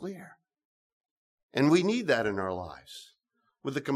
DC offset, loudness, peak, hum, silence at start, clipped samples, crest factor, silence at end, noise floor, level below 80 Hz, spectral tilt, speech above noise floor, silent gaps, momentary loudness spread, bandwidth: under 0.1%; -28 LUFS; -10 dBFS; none; 0 s; under 0.1%; 20 dB; 0 s; -77 dBFS; -70 dBFS; -5.5 dB/octave; 48 dB; 0.65-1.01 s, 1.11-1.49 s; 22 LU; 14 kHz